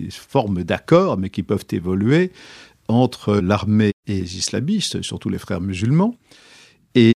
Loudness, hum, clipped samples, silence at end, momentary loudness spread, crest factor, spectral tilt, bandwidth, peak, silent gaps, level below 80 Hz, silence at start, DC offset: -20 LUFS; none; under 0.1%; 0 s; 9 LU; 18 dB; -6 dB/octave; 13.5 kHz; -2 dBFS; 3.93-4.03 s; -50 dBFS; 0 s; under 0.1%